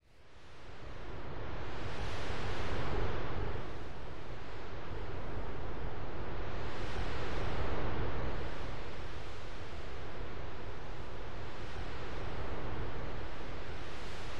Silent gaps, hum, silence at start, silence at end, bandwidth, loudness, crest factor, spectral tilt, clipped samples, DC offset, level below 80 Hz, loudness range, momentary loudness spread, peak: none; none; 0 s; 0 s; 11 kHz; -43 LUFS; 14 dB; -6 dB/octave; under 0.1%; 3%; -46 dBFS; 5 LU; 9 LU; -20 dBFS